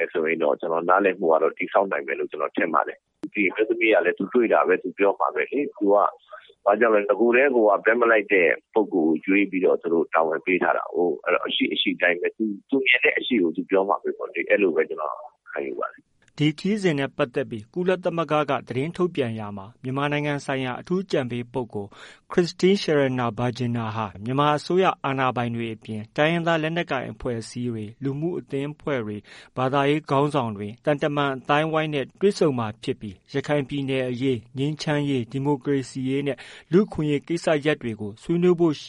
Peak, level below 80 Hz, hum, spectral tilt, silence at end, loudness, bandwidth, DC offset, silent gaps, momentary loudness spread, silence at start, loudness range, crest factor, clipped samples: -4 dBFS; -60 dBFS; none; -6.5 dB/octave; 0 s; -23 LUFS; 11 kHz; under 0.1%; none; 11 LU; 0 s; 6 LU; 20 dB; under 0.1%